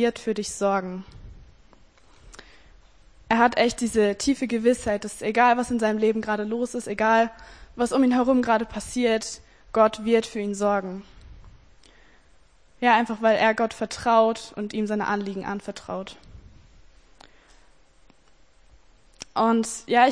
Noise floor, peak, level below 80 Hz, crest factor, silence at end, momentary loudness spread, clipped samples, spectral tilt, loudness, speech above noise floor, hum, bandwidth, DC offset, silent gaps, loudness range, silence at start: -59 dBFS; -4 dBFS; -52 dBFS; 20 dB; 0 s; 13 LU; under 0.1%; -4.5 dB/octave; -23 LUFS; 36 dB; none; 10.5 kHz; 0.1%; none; 9 LU; 0 s